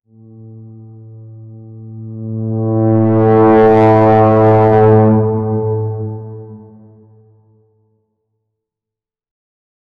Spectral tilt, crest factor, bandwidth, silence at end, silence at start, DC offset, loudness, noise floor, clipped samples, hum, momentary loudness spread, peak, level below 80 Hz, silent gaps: -11 dB/octave; 12 dB; 4.6 kHz; 3.4 s; 0.4 s; under 0.1%; -11 LUFS; -86 dBFS; under 0.1%; none; 21 LU; 0 dBFS; -46 dBFS; none